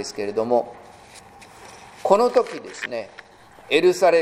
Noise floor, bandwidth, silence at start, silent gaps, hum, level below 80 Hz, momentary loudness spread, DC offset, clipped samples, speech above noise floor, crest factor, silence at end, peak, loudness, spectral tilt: -46 dBFS; 15 kHz; 0 s; none; none; -62 dBFS; 24 LU; under 0.1%; under 0.1%; 25 dB; 22 dB; 0 s; 0 dBFS; -21 LUFS; -4 dB/octave